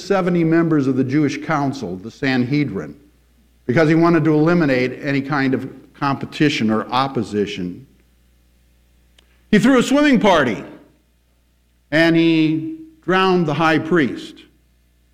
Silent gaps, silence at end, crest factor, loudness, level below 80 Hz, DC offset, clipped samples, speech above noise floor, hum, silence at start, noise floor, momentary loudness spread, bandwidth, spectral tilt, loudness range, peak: none; 0.7 s; 16 dB; -17 LUFS; -50 dBFS; under 0.1%; under 0.1%; 42 dB; 60 Hz at -50 dBFS; 0 s; -59 dBFS; 14 LU; 12 kHz; -6.5 dB/octave; 4 LU; -2 dBFS